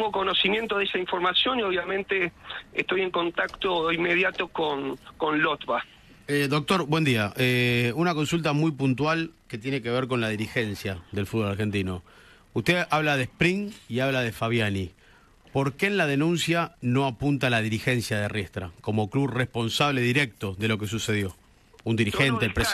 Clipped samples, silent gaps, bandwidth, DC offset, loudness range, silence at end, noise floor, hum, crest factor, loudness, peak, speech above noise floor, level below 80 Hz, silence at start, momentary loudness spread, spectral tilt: under 0.1%; none; 13.5 kHz; under 0.1%; 3 LU; 0 s; -55 dBFS; none; 18 dB; -25 LUFS; -8 dBFS; 30 dB; -54 dBFS; 0 s; 9 LU; -5 dB/octave